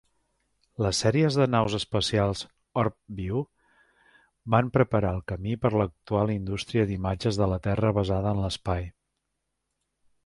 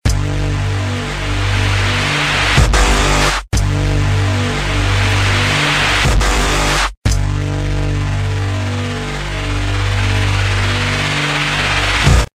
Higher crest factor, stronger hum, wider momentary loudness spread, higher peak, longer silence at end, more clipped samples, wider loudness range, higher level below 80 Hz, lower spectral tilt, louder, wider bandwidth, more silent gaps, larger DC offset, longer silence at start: first, 22 dB vs 14 dB; second, none vs 50 Hz at -30 dBFS; about the same, 9 LU vs 7 LU; second, -6 dBFS vs 0 dBFS; first, 1.35 s vs 0.1 s; neither; about the same, 2 LU vs 4 LU; second, -46 dBFS vs -20 dBFS; first, -6 dB/octave vs -4 dB/octave; second, -27 LUFS vs -15 LUFS; second, 11.5 kHz vs 15 kHz; second, none vs 6.97-7.02 s; neither; first, 0.8 s vs 0.05 s